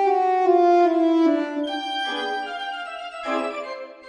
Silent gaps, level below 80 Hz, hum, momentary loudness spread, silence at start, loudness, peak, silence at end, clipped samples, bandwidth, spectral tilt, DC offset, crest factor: none; -70 dBFS; none; 14 LU; 0 s; -22 LUFS; -8 dBFS; 0 s; under 0.1%; 10 kHz; -3 dB/octave; under 0.1%; 14 dB